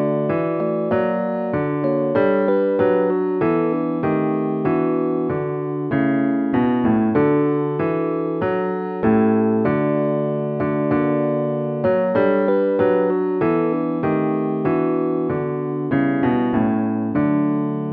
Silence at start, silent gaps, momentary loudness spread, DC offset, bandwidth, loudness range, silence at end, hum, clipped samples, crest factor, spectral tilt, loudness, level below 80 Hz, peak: 0 s; none; 5 LU; under 0.1%; 4.5 kHz; 1 LU; 0 s; none; under 0.1%; 14 dB; -12 dB/octave; -20 LUFS; -54 dBFS; -6 dBFS